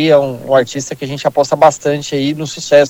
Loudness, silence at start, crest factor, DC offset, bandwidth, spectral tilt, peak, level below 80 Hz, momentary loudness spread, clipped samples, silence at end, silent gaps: -14 LUFS; 0 s; 12 dB; under 0.1%; 16 kHz; -4.5 dB/octave; 0 dBFS; -54 dBFS; 10 LU; 0.3%; 0 s; none